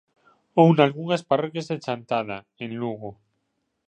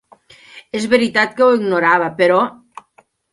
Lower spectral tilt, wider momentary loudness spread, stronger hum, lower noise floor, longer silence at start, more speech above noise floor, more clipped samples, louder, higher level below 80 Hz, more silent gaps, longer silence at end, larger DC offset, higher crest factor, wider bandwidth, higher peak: first, -7.5 dB/octave vs -5 dB/octave; first, 17 LU vs 9 LU; neither; first, -75 dBFS vs -55 dBFS; about the same, 0.55 s vs 0.55 s; first, 53 dB vs 40 dB; neither; second, -23 LUFS vs -15 LUFS; second, -68 dBFS vs -62 dBFS; neither; about the same, 0.75 s vs 0.8 s; neither; first, 22 dB vs 16 dB; second, 8.8 kHz vs 11.5 kHz; about the same, -2 dBFS vs 0 dBFS